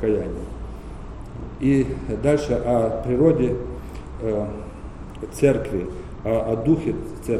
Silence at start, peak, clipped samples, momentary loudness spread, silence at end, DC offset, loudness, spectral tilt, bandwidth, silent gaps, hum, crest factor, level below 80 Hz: 0 s; -4 dBFS; under 0.1%; 17 LU; 0 s; under 0.1%; -22 LUFS; -8 dB/octave; 14.5 kHz; none; none; 18 dB; -36 dBFS